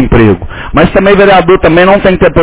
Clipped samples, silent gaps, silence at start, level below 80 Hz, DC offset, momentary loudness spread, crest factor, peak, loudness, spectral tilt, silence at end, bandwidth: 7%; none; 0 s; -20 dBFS; under 0.1%; 5 LU; 6 dB; 0 dBFS; -6 LUFS; -10.5 dB/octave; 0 s; 4 kHz